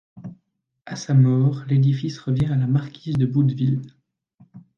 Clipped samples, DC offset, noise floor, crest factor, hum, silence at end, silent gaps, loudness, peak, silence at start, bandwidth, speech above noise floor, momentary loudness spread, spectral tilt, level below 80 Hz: under 0.1%; under 0.1%; -69 dBFS; 16 dB; none; 0.2 s; 4.34-4.38 s; -21 LUFS; -6 dBFS; 0.15 s; 7 kHz; 49 dB; 17 LU; -8 dB/octave; -52 dBFS